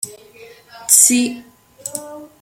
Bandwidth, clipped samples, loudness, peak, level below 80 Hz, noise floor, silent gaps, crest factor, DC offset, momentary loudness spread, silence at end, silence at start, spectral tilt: over 20 kHz; under 0.1%; -11 LUFS; 0 dBFS; -64 dBFS; -43 dBFS; none; 20 dB; under 0.1%; 24 LU; 0.15 s; 0.05 s; -0.5 dB/octave